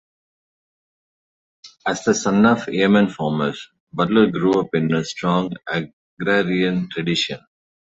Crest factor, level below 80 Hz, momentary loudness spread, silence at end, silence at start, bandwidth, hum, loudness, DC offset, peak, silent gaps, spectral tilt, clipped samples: 18 dB; -56 dBFS; 10 LU; 0.6 s; 1.65 s; 8 kHz; none; -20 LUFS; under 0.1%; -2 dBFS; 3.80-3.87 s, 5.93-6.17 s; -5.5 dB/octave; under 0.1%